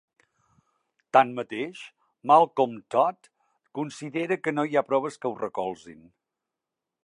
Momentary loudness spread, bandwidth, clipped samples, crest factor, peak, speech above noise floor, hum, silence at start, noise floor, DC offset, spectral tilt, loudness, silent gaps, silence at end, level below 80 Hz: 17 LU; 11 kHz; under 0.1%; 24 dB; -4 dBFS; 62 dB; none; 1.15 s; -87 dBFS; under 0.1%; -5.5 dB/octave; -25 LUFS; none; 1.1 s; -78 dBFS